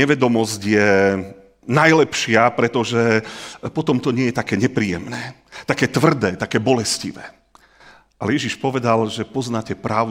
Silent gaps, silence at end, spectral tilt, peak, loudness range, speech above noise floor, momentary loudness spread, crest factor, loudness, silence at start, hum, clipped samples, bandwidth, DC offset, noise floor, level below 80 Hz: none; 0 s; -5 dB/octave; 0 dBFS; 5 LU; 31 dB; 14 LU; 18 dB; -18 LUFS; 0 s; none; under 0.1%; 16.5 kHz; under 0.1%; -49 dBFS; -56 dBFS